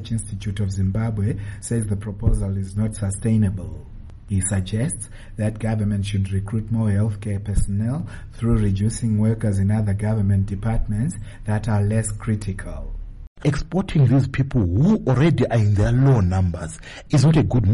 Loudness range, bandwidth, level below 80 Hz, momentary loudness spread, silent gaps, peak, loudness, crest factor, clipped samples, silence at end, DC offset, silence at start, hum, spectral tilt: 6 LU; 11.5 kHz; -32 dBFS; 12 LU; 13.27-13.36 s; -6 dBFS; -22 LUFS; 14 dB; under 0.1%; 0 s; under 0.1%; 0 s; none; -7 dB/octave